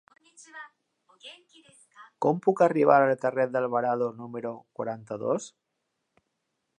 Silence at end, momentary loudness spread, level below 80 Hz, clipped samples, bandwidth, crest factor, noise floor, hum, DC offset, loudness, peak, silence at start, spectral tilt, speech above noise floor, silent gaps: 1.3 s; 25 LU; -82 dBFS; under 0.1%; 10 kHz; 22 dB; -80 dBFS; none; under 0.1%; -26 LUFS; -6 dBFS; 0.55 s; -6.5 dB/octave; 53 dB; none